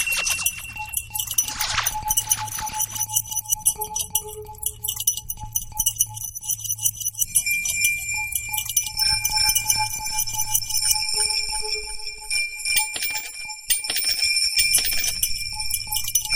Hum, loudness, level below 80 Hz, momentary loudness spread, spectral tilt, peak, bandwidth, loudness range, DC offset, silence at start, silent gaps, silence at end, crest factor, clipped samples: none; -21 LUFS; -44 dBFS; 9 LU; 1.5 dB/octave; -2 dBFS; 17 kHz; 3 LU; under 0.1%; 0 s; none; 0 s; 22 dB; under 0.1%